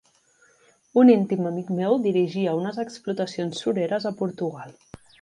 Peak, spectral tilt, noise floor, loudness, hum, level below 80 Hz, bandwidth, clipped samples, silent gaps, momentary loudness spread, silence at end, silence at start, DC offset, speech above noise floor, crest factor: -6 dBFS; -7 dB/octave; -61 dBFS; -23 LUFS; none; -68 dBFS; 10 kHz; under 0.1%; none; 14 LU; 0.5 s; 0.95 s; under 0.1%; 38 dB; 18 dB